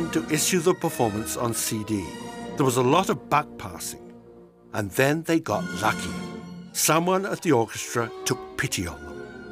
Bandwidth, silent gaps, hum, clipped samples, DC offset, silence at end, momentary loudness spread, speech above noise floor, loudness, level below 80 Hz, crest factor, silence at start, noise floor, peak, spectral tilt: 16 kHz; none; none; under 0.1%; under 0.1%; 0 s; 14 LU; 25 dB; -25 LUFS; -54 dBFS; 20 dB; 0 s; -49 dBFS; -6 dBFS; -4 dB/octave